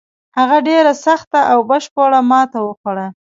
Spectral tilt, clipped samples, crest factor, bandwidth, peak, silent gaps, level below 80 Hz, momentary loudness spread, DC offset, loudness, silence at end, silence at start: -4.5 dB/octave; under 0.1%; 14 dB; 7.8 kHz; 0 dBFS; 1.27-1.31 s, 1.91-1.96 s, 2.77-2.84 s; -66 dBFS; 10 LU; under 0.1%; -13 LUFS; 0.15 s; 0.35 s